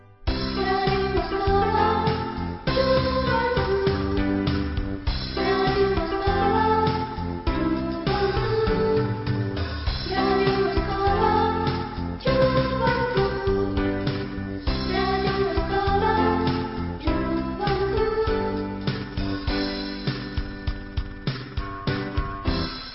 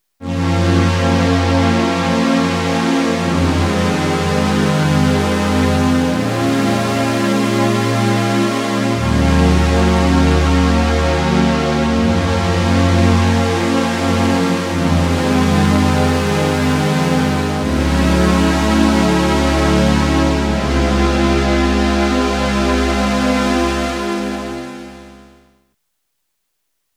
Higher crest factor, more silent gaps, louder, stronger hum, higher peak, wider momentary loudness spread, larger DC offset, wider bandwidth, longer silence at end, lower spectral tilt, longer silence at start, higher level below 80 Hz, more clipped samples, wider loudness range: about the same, 14 dB vs 14 dB; neither; second, -24 LUFS vs -15 LUFS; neither; second, -8 dBFS vs 0 dBFS; first, 8 LU vs 4 LU; neither; second, 5.8 kHz vs 15.5 kHz; second, 0 s vs 1.85 s; first, -10 dB/octave vs -6 dB/octave; about the same, 0.1 s vs 0.2 s; second, -34 dBFS vs -26 dBFS; neither; about the same, 4 LU vs 2 LU